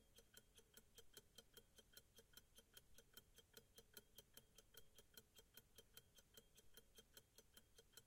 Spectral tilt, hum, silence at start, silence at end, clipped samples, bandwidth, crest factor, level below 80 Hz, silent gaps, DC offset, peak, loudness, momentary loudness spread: -1.5 dB/octave; none; 0 s; 0 s; under 0.1%; 16.5 kHz; 26 dB; -80 dBFS; none; under 0.1%; -44 dBFS; -68 LUFS; 3 LU